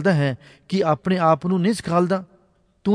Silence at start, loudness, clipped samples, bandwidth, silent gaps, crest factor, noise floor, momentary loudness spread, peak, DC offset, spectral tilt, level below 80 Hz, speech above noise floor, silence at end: 0 s; -21 LUFS; under 0.1%; 11 kHz; none; 16 dB; -60 dBFS; 8 LU; -4 dBFS; under 0.1%; -7 dB/octave; -58 dBFS; 40 dB; 0 s